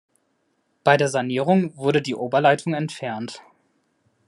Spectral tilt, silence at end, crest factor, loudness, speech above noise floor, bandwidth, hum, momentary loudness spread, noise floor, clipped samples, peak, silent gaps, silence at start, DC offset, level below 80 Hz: -5.5 dB/octave; 0.9 s; 20 dB; -21 LUFS; 49 dB; 11.5 kHz; none; 12 LU; -69 dBFS; under 0.1%; -2 dBFS; none; 0.85 s; under 0.1%; -70 dBFS